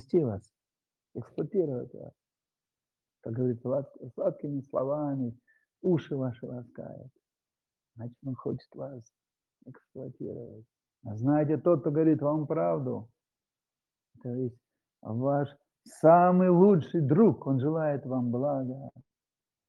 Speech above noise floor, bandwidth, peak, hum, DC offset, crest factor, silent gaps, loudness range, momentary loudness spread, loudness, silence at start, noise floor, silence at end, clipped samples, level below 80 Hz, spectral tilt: over 62 dB; 11 kHz; -8 dBFS; none; under 0.1%; 22 dB; none; 17 LU; 22 LU; -28 LUFS; 0.15 s; under -90 dBFS; 0.7 s; under 0.1%; -74 dBFS; -10.5 dB/octave